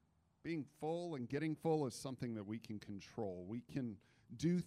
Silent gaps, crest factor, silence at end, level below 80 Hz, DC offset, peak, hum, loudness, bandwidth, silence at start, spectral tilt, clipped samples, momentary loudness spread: none; 16 dB; 0 s; -76 dBFS; under 0.1%; -26 dBFS; none; -44 LUFS; 14 kHz; 0.45 s; -7 dB/octave; under 0.1%; 11 LU